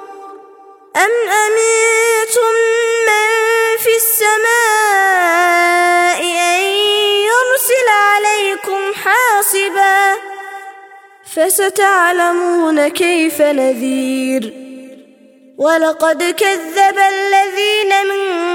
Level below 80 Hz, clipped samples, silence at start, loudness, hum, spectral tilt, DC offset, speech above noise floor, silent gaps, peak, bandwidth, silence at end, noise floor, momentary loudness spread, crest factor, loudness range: -68 dBFS; under 0.1%; 0 s; -12 LUFS; none; 0 dB/octave; under 0.1%; 31 dB; none; 0 dBFS; 17.5 kHz; 0 s; -44 dBFS; 6 LU; 12 dB; 4 LU